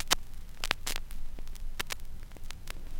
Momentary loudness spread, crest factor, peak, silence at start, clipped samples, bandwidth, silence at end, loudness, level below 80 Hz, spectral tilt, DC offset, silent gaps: 17 LU; 30 dB; -4 dBFS; 0 s; under 0.1%; 17 kHz; 0 s; -37 LUFS; -38 dBFS; -1 dB/octave; 0.1%; none